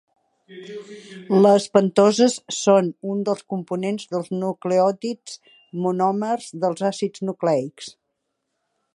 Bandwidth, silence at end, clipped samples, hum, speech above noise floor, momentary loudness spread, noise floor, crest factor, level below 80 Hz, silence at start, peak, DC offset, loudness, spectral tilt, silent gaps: 11.5 kHz; 1.05 s; under 0.1%; none; 56 dB; 21 LU; -77 dBFS; 20 dB; -74 dBFS; 0.5 s; -2 dBFS; under 0.1%; -21 LUFS; -5.5 dB/octave; none